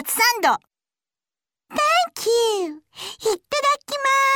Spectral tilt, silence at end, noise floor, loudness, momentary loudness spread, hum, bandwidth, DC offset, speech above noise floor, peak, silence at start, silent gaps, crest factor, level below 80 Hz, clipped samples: 0 dB/octave; 0 s; under -90 dBFS; -20 LUFS; 12 LU; none; 19 kHz; under 0.1%; over 70 dB; -6 dBFS; 0 s; none; 16 dB; -66 dBFS; under 0.1%